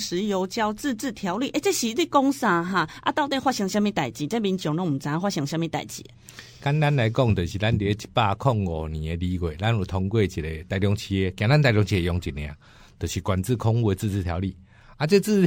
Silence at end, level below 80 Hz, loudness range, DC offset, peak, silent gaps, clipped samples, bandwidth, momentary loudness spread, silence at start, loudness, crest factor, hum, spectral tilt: 0 s; -44 dBFS; 2 LU; under 0.1%; -6 dBFS; none; under 0.1%; 17 kHz; 9 LU; 0 s; -24 LUFS; 18 dB; none; -6 dB/octave